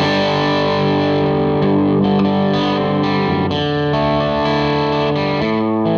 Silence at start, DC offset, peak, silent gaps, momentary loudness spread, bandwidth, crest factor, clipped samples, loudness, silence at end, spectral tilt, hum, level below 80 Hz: 0 s; under 0.1%; -6 dBFS; none; 3 LU; 7 kHz; 10 dB; under 0.1%; -16 LUFS; 0 s; -7.5 dB/octave; none; -42 dBFS